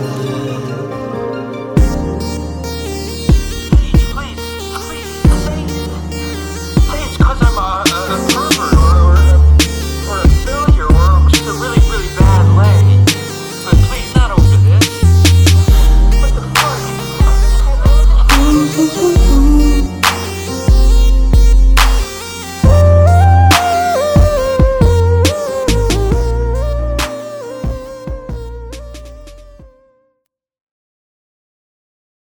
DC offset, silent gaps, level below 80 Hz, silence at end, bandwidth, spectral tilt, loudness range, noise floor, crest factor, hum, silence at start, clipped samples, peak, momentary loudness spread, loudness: under 0.1%; none; -14 dBFS; 2.6 s; over 20 kHz; -5.5 dB/octave; 8 LU; -68 dBFS; 10 dB; none; 0 s; under 0.1%; 0 dBFS; 14 LU; -12 LUFS